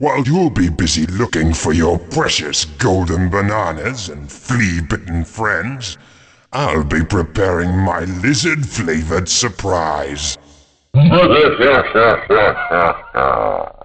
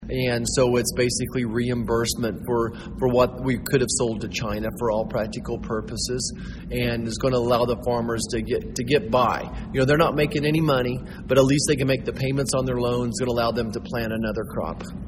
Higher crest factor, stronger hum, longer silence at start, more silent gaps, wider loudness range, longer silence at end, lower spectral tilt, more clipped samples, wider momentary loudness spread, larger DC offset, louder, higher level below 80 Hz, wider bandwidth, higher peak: about the same, 14 dB vs 18 dB; neither; about the same, 0 s vs 0 s; neither; about the same, 6 LU vs 4 LU; first, 0.15 s vs 0 s; about the same, -4.5 dB/octave vs -5 dB/octave; neither; about the same, 10 LU vs 8 LU; neither; first, -15 LUFS vs -24 LUFS; first, -32 dBFS vs -40 dBFS; second, 9.4 kHz vs 16 kHz; about the same, -2 dBFS vs -4 dBFS